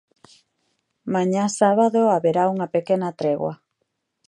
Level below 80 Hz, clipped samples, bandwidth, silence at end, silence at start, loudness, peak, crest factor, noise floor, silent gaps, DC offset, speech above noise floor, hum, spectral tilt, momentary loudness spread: -70 dBFS; under 0.1%; 11.5 kHz; 0.7 s; 1.05 s; -21 LUFS; -4 dBFS; 18 dB; -75 dBFS; none; under 0.1%; 56 dB; none; -6 dB/octave; 9 LU